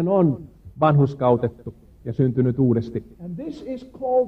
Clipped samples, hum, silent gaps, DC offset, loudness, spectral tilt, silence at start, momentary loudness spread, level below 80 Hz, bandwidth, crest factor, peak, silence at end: under 0.1%; none; none; under 0.1%; -22 LUFS; -10.5 dB/octave; 0 s; 16 LU; -50 dBFS; 5.8 kHz; 16 dB; -4 dBFS; 0 s